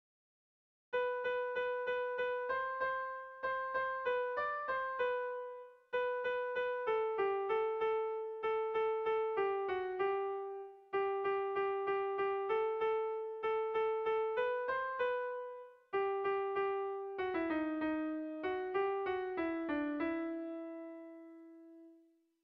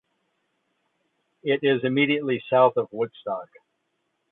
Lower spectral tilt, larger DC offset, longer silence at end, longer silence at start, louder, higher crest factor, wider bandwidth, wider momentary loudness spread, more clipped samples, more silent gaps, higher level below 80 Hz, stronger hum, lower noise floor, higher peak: second, -6.5 dB/octave vs -9.5 dB/octave; neither; second, 0.5 s vs 0.9 s; second, 0.9 s vs 1.45 s; second, -37 LUFS vs -23 LUFS; second, 12 dB vs 20 dB; first, 5.8 kHz vs 4.2 kHz; second, 8 LU vs 13 LU; neither; neither; about the same, -74 dBFS vs -74 dBFS; neither; second, -68 dBFS vs -75 dBFS; second, -24 dBFS vs -6 dBFS